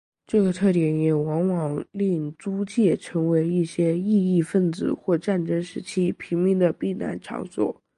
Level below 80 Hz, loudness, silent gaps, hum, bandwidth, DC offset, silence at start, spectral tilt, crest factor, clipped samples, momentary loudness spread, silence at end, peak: -62 dBFS; -24 LUFS; none; none; 11.5 kHz; under 0.1%; 0.35 s; -8 dB/octave; 16 dB; under 0.1%; 7 LU; 0.25 s; -8 dBFS